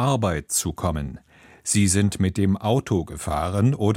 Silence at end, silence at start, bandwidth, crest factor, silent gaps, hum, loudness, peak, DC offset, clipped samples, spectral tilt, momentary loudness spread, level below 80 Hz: 0 s; 0 s; 16.5 kHz; 16 dB; none; none; -23 LUFS; -6 dBFS; under 0.1%; under 0.1%; -5 dB/octave; 8 LU; -40 dBFS